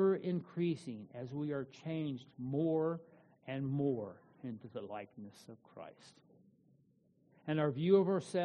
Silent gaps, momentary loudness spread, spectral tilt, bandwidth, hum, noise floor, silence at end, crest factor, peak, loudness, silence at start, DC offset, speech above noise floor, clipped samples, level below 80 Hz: none; 22 LU; -8 dB/octave; 9 kHz; none; -72 dBFS; 0 s; 20 dB; -18 dBFS; -37 LUFS; 0 s; under 0.1%; 34 dB; under 0.1%; -78 dBFS